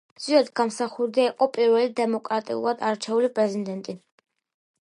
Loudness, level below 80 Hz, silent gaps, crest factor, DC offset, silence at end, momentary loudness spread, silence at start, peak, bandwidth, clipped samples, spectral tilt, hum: -24 LUFS; -80 dBFS; none; 18 dB; under 0.1%; 0.85 s; 10 LU; 0.2 s; -6 dBFS; 11.5 kHz; under 0.1%; -4.5 dB/octave; none